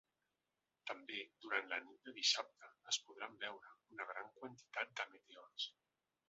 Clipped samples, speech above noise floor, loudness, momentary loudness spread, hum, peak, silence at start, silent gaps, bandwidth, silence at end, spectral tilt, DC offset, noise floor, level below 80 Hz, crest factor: under 0.1%; over 43 dB; -44 LUFS; 18 LU; none; -22 dBFS; 0.85 s; none; 7.6 kHz; 0.6 s; 2 dB/octave; under 0.1%; under -90 dBFS; under -90 dBFS; 26 dB